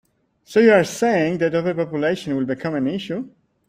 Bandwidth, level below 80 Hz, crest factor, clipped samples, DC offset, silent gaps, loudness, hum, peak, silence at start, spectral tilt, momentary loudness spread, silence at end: 15.5 kHz; -60 dBFS; 18 dB; under 0.1%; under 0.1%; none; -20 LUFS; none; -2 dBFS; 0.5 s; -6 dB/octave; 12 LU; 0.4 s